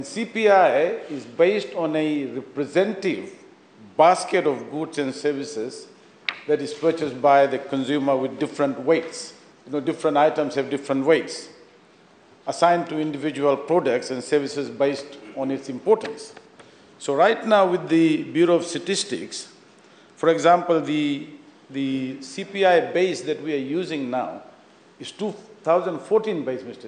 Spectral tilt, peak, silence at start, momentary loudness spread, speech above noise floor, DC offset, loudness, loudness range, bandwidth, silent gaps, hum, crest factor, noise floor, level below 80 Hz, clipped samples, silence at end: -5 dB/octave; -4 dBFS; 0 s; 15 LU; 31 dB; under 0.1%; -22 LUFS; 3 LU; 9.8 kHz; none; none; 20 dB; -53 dBFS; -76 dBFS; under 0.1%; 0 s